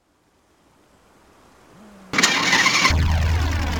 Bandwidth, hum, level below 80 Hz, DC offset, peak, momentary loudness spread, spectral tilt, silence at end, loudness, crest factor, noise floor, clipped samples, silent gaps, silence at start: 19 kHz; none; -28 dBFS; under 0.1%; -4 dBFS; 7 LU; -3 dB/octave; 0 s; -17 LUFS; 18 dB; -62 dBFS; under 0.1%; none; 2.15 s